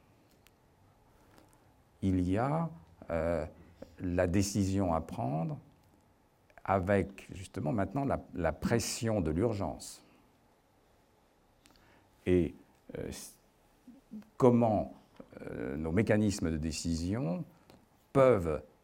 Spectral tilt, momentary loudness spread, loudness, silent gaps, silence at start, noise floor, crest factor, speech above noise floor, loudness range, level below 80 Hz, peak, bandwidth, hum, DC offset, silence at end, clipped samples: -6.5 dB/octave; 19 LU; -32 LUFS; none; 2 s; -67 dBFS; 24 dB; 36 dB; 7 LU; -56 dBFS; -10 dBFS; 16.5 kHz; none; under 0.1%; 0.2 s; under 0.1%